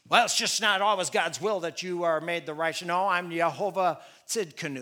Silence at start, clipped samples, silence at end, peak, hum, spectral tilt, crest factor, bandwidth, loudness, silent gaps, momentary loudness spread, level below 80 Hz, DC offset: 0.1 s; under 0.1%; 0 s; -4 dBFS; none; -2 dB/octave; 22 dB; 19 kHz; -27 LUFS; none; 9 LU; -82 dBFS; under 0.1%